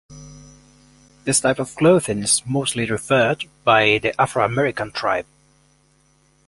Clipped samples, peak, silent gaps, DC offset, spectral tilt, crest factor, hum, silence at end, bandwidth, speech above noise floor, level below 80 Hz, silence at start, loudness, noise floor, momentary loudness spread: under 0.1%; -2 dBFS; none; under 0.1%; -3.5 dB/octave; 20 dB; none; 1.25 s; 11.5 kHz; 40 dB; -52 dBFS; 0.1 s; -19 LUFS; -59 dBFS; 7 LU